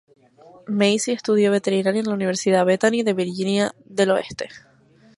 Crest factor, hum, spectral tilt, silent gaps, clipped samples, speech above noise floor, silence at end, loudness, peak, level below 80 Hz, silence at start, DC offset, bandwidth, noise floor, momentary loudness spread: 16 dB; none; -4.5 dB/octave; none; under 0.1%; 29 dB; 0.6 s; -20 LUFS; -6 dBFS; -64 dBFS; 0.7 s; under 0.1%; 11.5 kHz; -49 dBFS; 7 LU